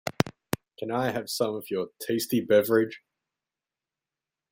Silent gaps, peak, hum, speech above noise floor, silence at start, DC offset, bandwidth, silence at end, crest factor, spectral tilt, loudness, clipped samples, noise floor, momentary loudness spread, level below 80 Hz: none; -2 dBFS; none; over 64 dB; 0.05 s; under 0.1%; 16.5 kHz; 1.55 s; 26 dB; -5 dB/octave; -28 LUFS; under 0.1%; under -90 dBFS; 12 LU; -66 dBFS